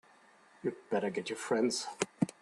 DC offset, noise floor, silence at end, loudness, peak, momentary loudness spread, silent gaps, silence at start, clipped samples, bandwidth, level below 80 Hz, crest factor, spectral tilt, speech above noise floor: under 0.1%; -63 dBFS; 0.1 s; -35 LUFS; -14 dBFS; 9 LU; none; 0.65 s; under 0.1%; 12.5 kHz; -78 dBFS; 22 dB; -4.5 dB/octave; 28 dB